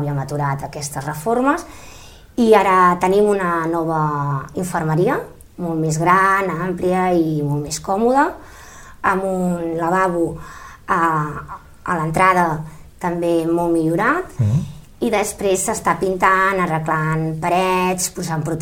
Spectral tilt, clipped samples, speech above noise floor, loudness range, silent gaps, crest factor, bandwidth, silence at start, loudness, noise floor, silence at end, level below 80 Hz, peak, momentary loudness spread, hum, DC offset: -5.5 dB/octave; under 0.1%; 21 dB; 3 LU; none; 18 dB; 16.5 kHz; 0 s; -18 LUFS; -39 dBFS; 0 s; -44 dBFS; 0 dBFS; 12 LU; none; under 0.1%